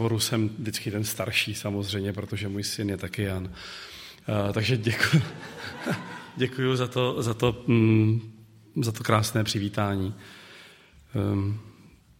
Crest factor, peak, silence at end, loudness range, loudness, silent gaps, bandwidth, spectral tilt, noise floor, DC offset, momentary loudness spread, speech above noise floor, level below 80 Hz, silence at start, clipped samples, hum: 22 dB; -4 dBFS; 0.35 s; 4 LU; -27 LUFS; none; 16.5 kHz; -5.5 dB/octave; -53 dBFS; under 0.1%; 15 LU; 27 dB; -56 dBFS; 0 s; under 0.1%; none